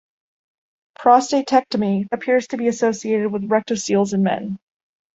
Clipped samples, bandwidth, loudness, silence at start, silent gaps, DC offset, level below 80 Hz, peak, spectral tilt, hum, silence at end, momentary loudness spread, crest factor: under 0.1%; 8 kHz; -19 LUFS; 1 s; none; under 0.1%; -62 dBFS; -2 dBFS; -5.5 dB/octave; none; 0.55 s; 7 LU; 18 dB